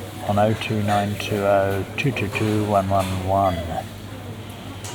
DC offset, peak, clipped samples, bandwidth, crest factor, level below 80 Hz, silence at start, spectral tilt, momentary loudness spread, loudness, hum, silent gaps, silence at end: under 0.1%; -6 dBFS; under 0.1%; over 20 kHz; 16 dB; -46 dBFS; 0 s; -6 dB/octave; 15 LU; -22 LUFS; none; none; 0 s